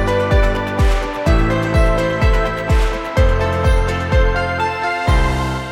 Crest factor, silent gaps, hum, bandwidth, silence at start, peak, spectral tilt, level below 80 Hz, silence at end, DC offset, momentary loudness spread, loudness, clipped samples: 14 dB; none; none; 12.5 kHz; 0 s; -2 dBFS; -6.5 dB/octave; -18 dBFS; 0 s; under 0.1%; 3 LU; -17 LUFS; under 0.1%